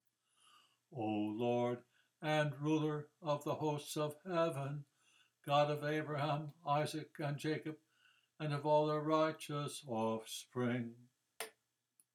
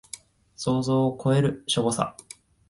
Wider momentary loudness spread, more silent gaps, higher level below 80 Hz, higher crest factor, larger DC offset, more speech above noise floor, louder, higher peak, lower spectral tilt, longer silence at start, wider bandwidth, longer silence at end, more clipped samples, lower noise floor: second, 14 LU vs 19 LU; neither; second, -86 dBFS vs -58 dBFS; about the same, 20 dB vs 20 dB; neither; first, 40 dB vs 22 dB; second, -39 LUFS vs -25 LUFS; second, -20 dBFS vs -6 dBFS; about the same, -6 dB/octave vs -5.5 dB/octave; first, 0.9 s vs 0.15 s; first, 16 kHz vs 11.5 kHz; about the same, 0.65 s vs 0.6 s; neither; first, -78 dBFS vs -46 dBFS